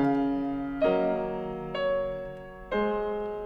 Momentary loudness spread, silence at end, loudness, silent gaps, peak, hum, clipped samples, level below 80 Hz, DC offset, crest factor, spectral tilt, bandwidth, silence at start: 9 LU; 0 s; -29 LUFS; none; -14 dBFS; none; under 0.1%; -50 dBFS; under 0.1%; 14 dB; -8.5 dB/octave; 5.4 kHz; 0 s